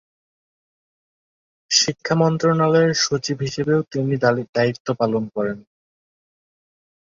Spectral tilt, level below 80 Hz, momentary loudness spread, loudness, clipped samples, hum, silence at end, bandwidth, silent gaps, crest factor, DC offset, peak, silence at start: -4.5 dB/octave; -60 dBFS; 8 LU; -20 LUFS; under 0.1%; none; 1.45 s; 7.6 kHz; 4.49-4.53 s, 4.80-4.85 s; 20 dB; under 0.1%; -2 dBFS; 1.7 s